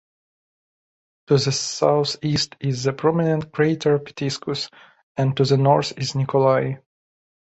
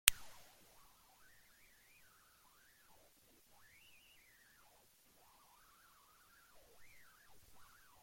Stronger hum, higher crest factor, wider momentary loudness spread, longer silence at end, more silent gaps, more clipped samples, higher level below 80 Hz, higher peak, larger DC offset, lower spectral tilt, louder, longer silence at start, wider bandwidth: neither; second, 18 dB vs 48 dB; first, 9 LU vs 4 LU; second, 0.8 s vs 7.7 s; first, 5.03-5.15 s vs none; neither; first, -56 dBFS vs -68 dBFS; second, -4 dBFS vs 0 dBFS; neither; first, -5.5 dB/octave vs 2.5 dB/octave; first, -21 LUFS vs -37 LUFS; first, 1.3 s vs 0.05 s; second, 8.2 kHz vs 16.5 kHz